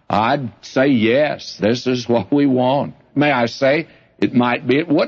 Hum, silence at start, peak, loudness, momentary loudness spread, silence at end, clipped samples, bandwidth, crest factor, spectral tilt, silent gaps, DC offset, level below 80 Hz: none; 0.1 s; -2 dBFS; -17 LUFS; 7 LU; 0 s; under 0.1%; 7.2 kHz; 14 dB; -6.5 dB/octave; none; under 0.1%; -58 dBFS